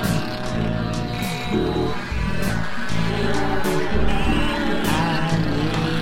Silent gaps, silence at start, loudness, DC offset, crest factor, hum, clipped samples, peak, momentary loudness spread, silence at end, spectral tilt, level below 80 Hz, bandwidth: none; 0 s; -23 LUFS; under 0.1%; 14 dB; none; under 0.1%; -6 dBFS; 4 LU; 0 s; -5.5 dB/octave; -30 dBFS; 16.5 kHz